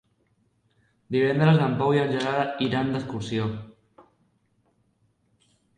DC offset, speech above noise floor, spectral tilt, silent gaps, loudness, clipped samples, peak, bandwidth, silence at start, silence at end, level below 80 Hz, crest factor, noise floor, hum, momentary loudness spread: under 0.1%; 45 dB; -7.5 dB/octave; none; -24 LUFS; under 0.1%; -8 dBFS; 9.6 kHz; 1.1 s; 2.05 s; -60 dBFS; 18 dB; -68 dBFS; none; 10 LU